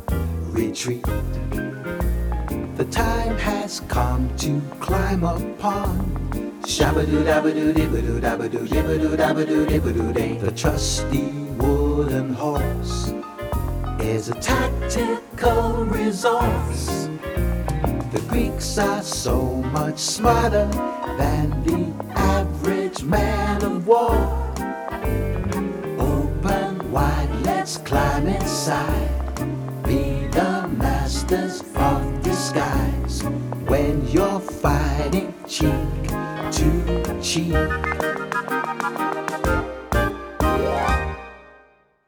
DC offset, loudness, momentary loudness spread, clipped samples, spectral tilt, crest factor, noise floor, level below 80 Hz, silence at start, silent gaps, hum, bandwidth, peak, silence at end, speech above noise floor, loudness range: under 0.1%; -22 LUFS; 7 LU; under 0.1%; -5.5 dB/octave; 18 dB; -55 dBFS; -28 dBFS; 0 s; none; none; 19.5 kHz; -4 dBFS; 0.6 s; 34 dB; 3 LU